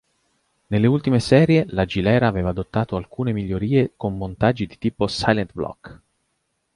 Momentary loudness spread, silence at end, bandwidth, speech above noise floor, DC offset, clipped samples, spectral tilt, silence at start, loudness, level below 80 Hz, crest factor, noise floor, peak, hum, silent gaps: 11 LU; 0.8 s; 11.5 kHz; 52 dB; under 0.1%; under 0.1%; -7 dB/octave; 0.7 s; -21 LUFS; -42 dBFS; 20 dB; -72 dBFS; -2 dBFS; none; none